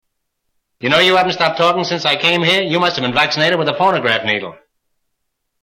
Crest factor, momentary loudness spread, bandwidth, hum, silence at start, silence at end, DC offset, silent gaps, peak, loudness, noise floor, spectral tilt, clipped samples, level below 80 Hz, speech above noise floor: 14 dB; 5 LU; 17 kHz; none; 0.8 s; 1.1 s; under 0.1%; none; -2 dBFS; -14 LUFS; -71 dBFS; -4 dB/octave; under 0.1%; -56 dBFS; 56 dB